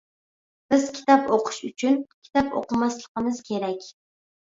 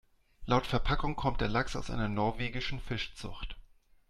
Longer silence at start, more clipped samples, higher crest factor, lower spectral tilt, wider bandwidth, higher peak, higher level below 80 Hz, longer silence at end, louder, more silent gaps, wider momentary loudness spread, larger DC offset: first, 0.7 s vs 0.4 s; neither; about the same, 22 dB vs 18 dB; second, -4.5 dB/octave vs -6 dB/octave; second, 7.8 kHz vs 11.5 kHz; first, -2 dBFS vs -14 dBFS; second, -60 dBFS vs -40 dBFS; first, 0.7 s vs 0.45 s; first, -24 LUFS vs -34 LUFS; first, 2.14-2.22 s, 3.08-3.15 s vs none; second, 9 LU vs 14 LU; neither